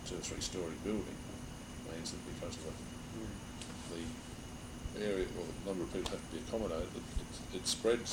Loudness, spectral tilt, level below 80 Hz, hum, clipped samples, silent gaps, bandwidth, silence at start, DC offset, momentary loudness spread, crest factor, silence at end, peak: -41 LUFS; -4 dB/octave; -52 dBFS; none; under 0.1%; none; over 20 kHz; 0 s; under 0.1%; 10 LU; 20 dB; 0 s; -20 dBFS